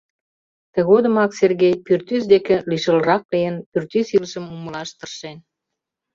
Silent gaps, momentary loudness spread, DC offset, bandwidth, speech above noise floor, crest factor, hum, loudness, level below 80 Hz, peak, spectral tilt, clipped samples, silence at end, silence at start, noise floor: 3.25-3.29 s, 3.66-3.72 s; 15 LU; under 0.1%; 7.6 kHz; 64 dB; 18 dB; none; -18 LUFS; -60 dBFS; -2 dBFS; -6 dB/octave; under 0.1%; 0.75 s; 0.75 s; -82 dBFS